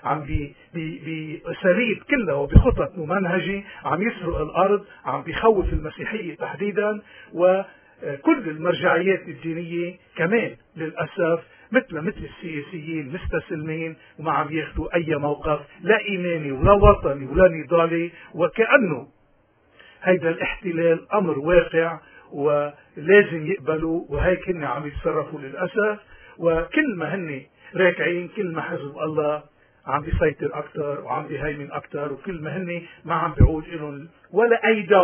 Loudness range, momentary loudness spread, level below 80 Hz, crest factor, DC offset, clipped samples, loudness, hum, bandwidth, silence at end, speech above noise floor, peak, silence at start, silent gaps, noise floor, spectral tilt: 7 LU; 14 LU; -34 dBFS; 22 dB; under 0.1%; under 0.1%; -23 LUFS; none; 3.5 kHz; 0 s; 38 dB; 0 dBFS; 0.05 s; none; -60 dBFS; -10.5 dB/octave